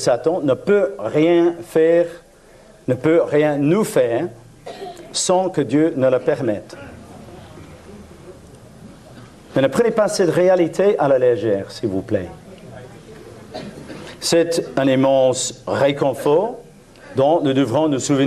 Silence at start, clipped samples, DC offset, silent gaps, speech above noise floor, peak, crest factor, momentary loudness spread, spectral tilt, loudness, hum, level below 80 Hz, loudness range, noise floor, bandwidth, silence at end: 0 s; under 0.1%; under 0.1%; none; 30 dB; -4 dBFS; 16 dB; 22 LU; -5 dB/octave; -18 LUFS; none; -54 dBFS; 6 LU; -46 dBFS; 13.5 kHz; 0 s